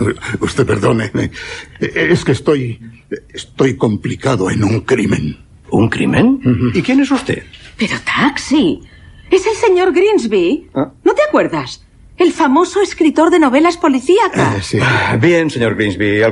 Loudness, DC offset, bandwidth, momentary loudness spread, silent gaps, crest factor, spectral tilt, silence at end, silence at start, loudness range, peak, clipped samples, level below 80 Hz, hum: -13 LUFS; under 0.1%; 11.5 kHz; 11 LU; none; 14 dB; -6 dB/octave; 0 s; 0 s; 4 LU; 0 dBFS; under 0.1%; -40 dBFS; none